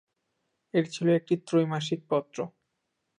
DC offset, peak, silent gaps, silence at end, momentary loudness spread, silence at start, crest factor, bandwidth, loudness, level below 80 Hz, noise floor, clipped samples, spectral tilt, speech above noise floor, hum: under 0.1%; -14 dBFS; none; 0.7 s; 12 LU; 0.75 s; 16 dB; 10.5 kHz; -28 LUFS; -78 dBFS; -80 dBFS; under 0.1%; -6.5 dB/octave; 53 dB; none